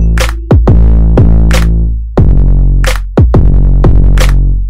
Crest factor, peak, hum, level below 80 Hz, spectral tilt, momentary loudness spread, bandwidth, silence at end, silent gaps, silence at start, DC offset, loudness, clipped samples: 6 dB; 0 dBFS; none; -6 dBFS; -7 dB/octave; 4 LU; 11.5 kHz; 0 s; none; 0 s; 10%; -9 LUFS; 0.2%